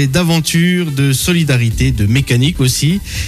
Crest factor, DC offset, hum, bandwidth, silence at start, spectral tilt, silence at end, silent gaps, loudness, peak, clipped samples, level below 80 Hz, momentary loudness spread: 8 dB; under 0.1%; none; 15 kHz; 0 s; -5 dB/octave; 0 s; none; -13 LUFS; -4 dBFS; under 0.1%; -28 dBFS; 2 LU